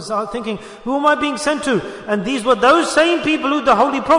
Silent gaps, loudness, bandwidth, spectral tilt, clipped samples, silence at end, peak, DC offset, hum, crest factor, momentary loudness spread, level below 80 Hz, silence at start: none; -16 LUFS; 11 kHz; -4 dB/octave; under 0.1%; 0 s; -2 dBFS; under 0.1%; none; 14 dB; 11 LU; -50 dBFS; 0 s